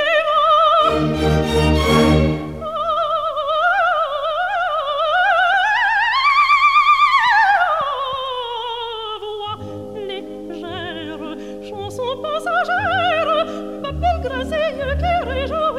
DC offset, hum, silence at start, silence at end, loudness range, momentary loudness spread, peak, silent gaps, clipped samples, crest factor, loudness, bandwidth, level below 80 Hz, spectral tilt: 0.3%; none; 0 s; 0 s; 13 LU; 16 LU; -2 dBFS; none; under 0.1%; 16 dB; -17 LUFS; 15.5 kHz; -34 dBFS; -5.5 dB/octave